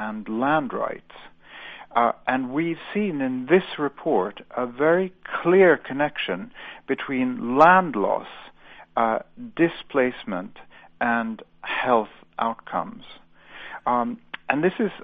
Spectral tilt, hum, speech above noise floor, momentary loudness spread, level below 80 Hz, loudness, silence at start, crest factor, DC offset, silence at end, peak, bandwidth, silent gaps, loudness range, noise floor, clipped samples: -8 dB/octave; none; 20 dB; 18 LU; -60 dBFS; -23 LUFS; 0 s; 22 dB; under 0.1%; 0 s; -2 dBFS; 6.2 kHz; none; 6 LU; -43 dBFS; under 0.1%